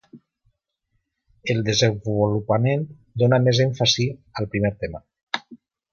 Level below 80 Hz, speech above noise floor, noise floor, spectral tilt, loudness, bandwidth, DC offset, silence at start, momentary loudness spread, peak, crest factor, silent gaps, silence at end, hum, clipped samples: -50 dBFS; 53 dB; -73 dBFS; -5 dB/octave; -22 LUFS; 7.2 kHz; under 0.1%; 0.15 s; 14 LU; -4 dBFS; 18 dB; 5.23-5.27 s; 0.35 s; none; under 0.1%